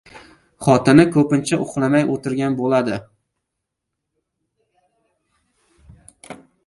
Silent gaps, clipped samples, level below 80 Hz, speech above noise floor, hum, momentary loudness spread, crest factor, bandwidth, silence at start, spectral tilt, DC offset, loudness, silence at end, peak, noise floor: none; under 0.1%; -54 dBFS; 63 dB; none; 18 LU; 20 dB; 11.5 kHz; 0.15 s; -6.5 dB/octave; under 0.1%; -17 LUFS; 0.3 s; 0 dBFS; -80 dBFS